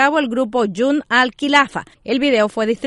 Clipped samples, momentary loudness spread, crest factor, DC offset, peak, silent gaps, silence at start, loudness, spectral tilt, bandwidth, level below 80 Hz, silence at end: under 0.1%; 6 LU; 16 dB; under 0.1%; 0 dBFS; none; 0 s; -17 LUFS; -4 dB/octave; 11.5 kHz; -54 dBFS; 0 s